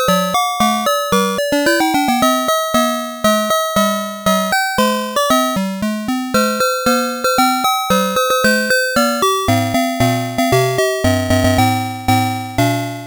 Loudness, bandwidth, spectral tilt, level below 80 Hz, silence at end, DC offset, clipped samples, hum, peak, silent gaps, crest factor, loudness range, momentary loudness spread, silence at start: -15 LUFS; over 20 kHz; -4 dB/octave; -42 dBFS; 0 s; under 0.1%; under 0.1%; none; -4 dBFS; none; 10 dB; 1 LU; 4 LU; 0 s